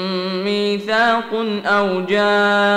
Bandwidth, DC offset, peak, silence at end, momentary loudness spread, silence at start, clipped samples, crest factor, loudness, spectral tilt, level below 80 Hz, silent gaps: 13.5 kHz; under 0.1%; -4 dBFS; 0 s; 6 LU; 0 s; under 0.1%; 12 dB; -17 LUFS; -5 dB/octave; -62 dBFS; none